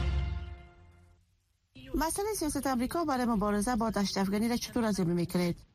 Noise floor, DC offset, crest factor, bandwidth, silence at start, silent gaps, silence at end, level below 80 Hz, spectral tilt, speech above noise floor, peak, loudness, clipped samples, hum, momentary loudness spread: -73 dBFS; under 0.1%; 14 dB; 15.5 kHz; 0 s; none; 0.15 s; -42 dBFS; -5 dB/octave; 42 dB; -18 dBFS; -31 LUFS; under 0.1%; none; 8 LU